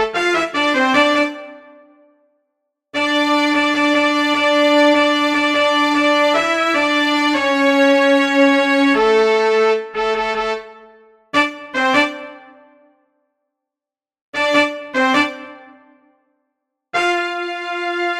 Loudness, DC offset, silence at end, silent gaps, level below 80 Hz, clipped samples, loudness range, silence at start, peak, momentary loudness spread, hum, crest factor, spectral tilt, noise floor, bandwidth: -15 LUFS; under 0.1%; 0 s; 14.21-14.33 s; -56 dBFS; under 0.1%; 7 LU; 0 s; 0 dBFS; 9 LU; none; 16 dB; -2.5 dB/octave; -89 dBFS; 13.5 kHz